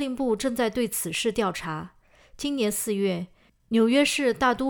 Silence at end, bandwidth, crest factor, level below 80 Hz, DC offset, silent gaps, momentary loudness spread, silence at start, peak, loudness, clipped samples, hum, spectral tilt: 0 s; over 20 kHz; 18 dB; -56 dBFS; under 0.1%; none; 13 LU; 0 s; -8 dBFS; -25 LUFS; under 0.1%; none; -4 dB/octave